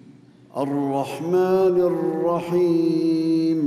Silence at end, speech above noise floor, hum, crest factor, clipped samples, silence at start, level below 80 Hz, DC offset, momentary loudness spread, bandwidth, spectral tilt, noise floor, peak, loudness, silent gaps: 0 s; 28 dB; none; 10 dB; under 0.1%; 0.55 s; -66 dBFS; under 0.1%; 8 LU; 14.5 kHz; -8 dB/octave; -48 dBFS; -10 dBFS; -21 LUFS; none